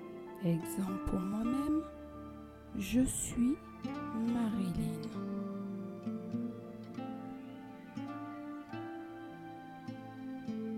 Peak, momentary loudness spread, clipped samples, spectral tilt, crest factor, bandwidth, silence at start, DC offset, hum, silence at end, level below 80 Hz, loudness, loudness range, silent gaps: -20 dBFS; 14 LU; under 0.1%; -6 dB/octave; 18 dB; 16 kHz; 0 s; under 0.1%; none; 0 s; -54 dBFS; -39 LUFS; 10 LU; none